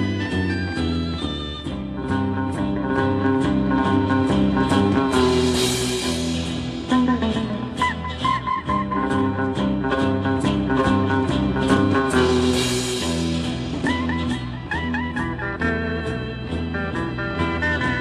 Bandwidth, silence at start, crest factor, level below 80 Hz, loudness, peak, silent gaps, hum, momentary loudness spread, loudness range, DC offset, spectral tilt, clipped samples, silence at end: 14 kHz; 0 s; 16 dB; -36 dBFS; -22 LUFS; -4 dBFS; none; none; 8 LU; 5 LU; under 0.1%; -5.5 dB/octave; under 0.1%; 0 s